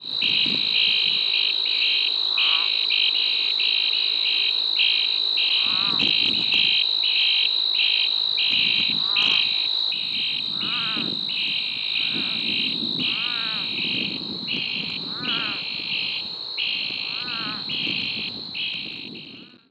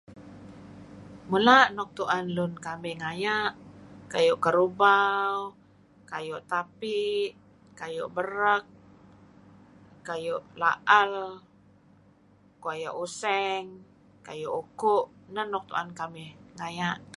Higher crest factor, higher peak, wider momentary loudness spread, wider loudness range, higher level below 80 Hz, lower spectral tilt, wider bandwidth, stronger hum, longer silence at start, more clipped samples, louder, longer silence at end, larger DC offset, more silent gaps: second, 18 dB vs 24 dB; about the same, -6 dBFS vs -6 dBFS; second, 9 LU vs 22 LU; about the same, 7 LU vs 7 LU; about the same, -68 dBFS vs -68 dBFS; second, -2.5 dB/octave vs -4.5 dB/octave; second, 8.6 kHz vs 11.5 kHz; second, none vs 50 Hz at -60 dBFS; about the same, 0 s vs 0.1 s; neither; first, -20 LUFS vs -27 LUFS; first, 0.25 s vs 0.1 s; neither; neither